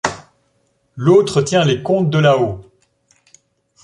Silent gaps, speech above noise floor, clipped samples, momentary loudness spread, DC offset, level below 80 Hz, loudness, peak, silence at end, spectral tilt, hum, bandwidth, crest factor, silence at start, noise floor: none; 49 dB; under 0.1%; 11 LU; under 0.1%; -50 dBFS; -15 LUFS; 0 dBFS; 1.2 s; -6 dB/octave; none; 11.5 kHz; 16 dB; 0.05 s; -63 dBFS